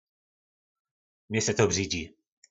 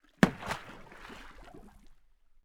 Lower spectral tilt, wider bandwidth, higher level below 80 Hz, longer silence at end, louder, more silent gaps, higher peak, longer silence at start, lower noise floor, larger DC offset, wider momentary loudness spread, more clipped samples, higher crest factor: second, -3.5 dB/octave vs -6 dB/octave; second, 8.2 kHz vs 18 kHz; about the same, -60 dBFS vs -56 dBFS; second, 0.45 s vs 0.75 s; first, -27 LUFS vs -32 LUFS; neither; second, -10 dBFS vs -2 dBFS; first, 1.3 s vs 0.2 s; first, under -90 dBFS vs -61 dBFS; neither; second, 9 LU vs 25 LU; neither; second, 22 dB vs 34 dB